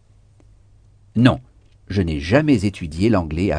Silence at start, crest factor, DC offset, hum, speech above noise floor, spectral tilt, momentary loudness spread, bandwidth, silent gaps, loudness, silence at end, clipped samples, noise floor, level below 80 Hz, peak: 1.15 s; 20 dB; under 0.1%; none; 33 dB; -7.5 dB/octave; 10 LU; 10 kHz; none; -19 LUFS; 0 s; under 0.1%; -51 dBFS; -38 dBFS; 0 dBFS